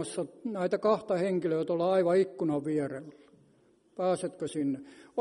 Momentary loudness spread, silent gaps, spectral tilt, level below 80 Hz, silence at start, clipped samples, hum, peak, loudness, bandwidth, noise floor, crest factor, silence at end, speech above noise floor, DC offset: 11 LU; none; -6.5 dB/octave; -76 dBFS; 0 s; under 0.1%; none; -14 dBFS; -30 LUFS; 11 kHz; -65 dBFS; 18 dB; 0 s; 35 dB; under 0.1%